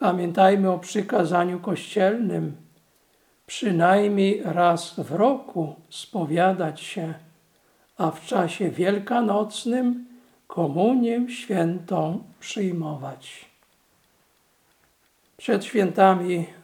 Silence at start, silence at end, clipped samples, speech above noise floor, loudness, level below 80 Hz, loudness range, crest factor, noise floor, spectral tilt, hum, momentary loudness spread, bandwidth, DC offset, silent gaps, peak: 0 s; 0.1 s; under 0.1%; 42 dB; -23 LUFS; -76 dBFS; 7 LU; 22 dB; -64 dBFS; -6 dB/octave; none; 15 LU; 15.5 kHz; under 0.1%; none; -2 dBFS